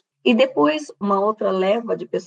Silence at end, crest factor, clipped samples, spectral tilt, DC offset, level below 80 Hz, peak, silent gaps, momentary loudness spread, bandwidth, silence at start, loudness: 0 s; 16 dB; under 0.1%; -5.5 dB/octave; under 0.1%; -78 dBFS; -4 dBFS; none; 6 LU; 9.2 kHz; 0.25 s; -20 LUFS